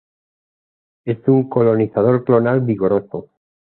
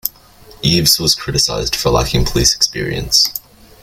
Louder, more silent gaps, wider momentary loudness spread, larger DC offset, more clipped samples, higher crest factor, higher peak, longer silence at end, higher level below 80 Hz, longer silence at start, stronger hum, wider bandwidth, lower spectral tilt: second, -16 LUFS vs -13 LUFS; neither; first, 14 LU vs 8 LU; neither; neither; about the same, 16 dB vs 16 dB; about the same, -2 dBFS vs 0 dBFS; about the same, 0.4 s vs 0.45 s; second, -56 dBFS vs -28 dBFS; first, 1.05 s vs 0.05 s; neither; second, 4.3 kHz vs 17 kHz; first, -14 dB/octave vs -3 dB/octave